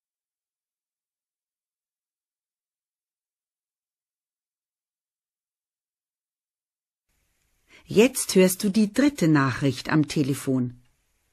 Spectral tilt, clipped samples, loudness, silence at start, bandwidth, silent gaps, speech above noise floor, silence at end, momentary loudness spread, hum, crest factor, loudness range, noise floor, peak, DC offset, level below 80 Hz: -5.5 dB/octave; under 0.1%; -22 LUFS; 7.9 s; 14 kHz; none; over 68 dB; 0.6 s; 7 LU; none; 22 dB; 6 LU; under -90 dBFS; -4 dBFS; under 0.1%; -62 dBFS